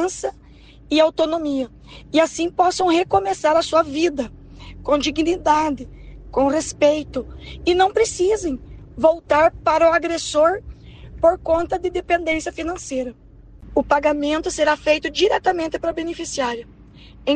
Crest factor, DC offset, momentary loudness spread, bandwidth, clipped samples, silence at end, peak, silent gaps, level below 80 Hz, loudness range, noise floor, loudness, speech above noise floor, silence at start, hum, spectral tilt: 16 dB; under 0.1%; 12 LU; 9.8 kHz; under 0.1%; 0 s; -4 dBFS; none; -42 dBFS; 3 LU; -45 dBFS; -20 LUFS; 26 dB; 0 s; none; -3.5 dB/octave